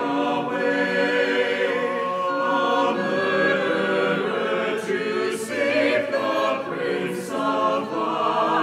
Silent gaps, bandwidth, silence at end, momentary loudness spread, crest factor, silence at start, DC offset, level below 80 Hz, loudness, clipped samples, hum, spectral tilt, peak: none; 15 kHz; 0 s; 5 LU; 14 dB; 0 s; under 0.1%; -70 dBFS; -22 LUFS; under 0.1%; none; -4.5 dB/octave; -8 dBFS